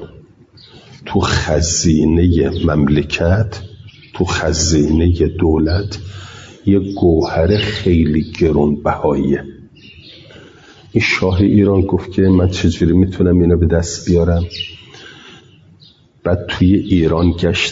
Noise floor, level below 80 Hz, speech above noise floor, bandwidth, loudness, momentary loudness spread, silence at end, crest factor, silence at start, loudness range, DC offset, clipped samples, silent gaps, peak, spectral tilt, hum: -47 dBFS; -32 dBFS; 33 dB; 7.8 kHz; -15 LUFS; 11 LU; 0 s; 12 dB; 0 s; 4 LU; under 0.1%; under 0.1%; none; -2 dBFS; -6 dB/octave; none